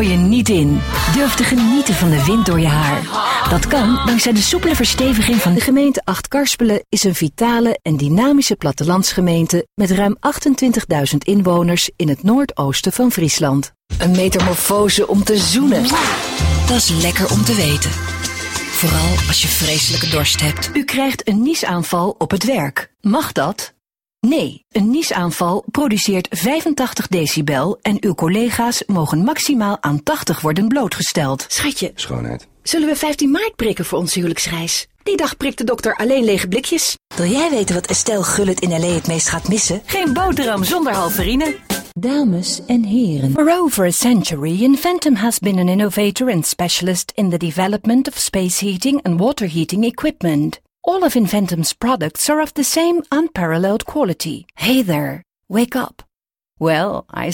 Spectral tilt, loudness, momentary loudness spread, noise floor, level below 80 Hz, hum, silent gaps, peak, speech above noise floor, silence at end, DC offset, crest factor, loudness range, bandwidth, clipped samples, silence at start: -4.5 dB/octave; -16 LUFS; 6 LU; -82 dBFS; -34 dBFS; none; none; -2 dBFS; 66 dB; 0 s; under 0.1%; 14 dB; 4 LU; 18 kHz; under 0.1%; 0 s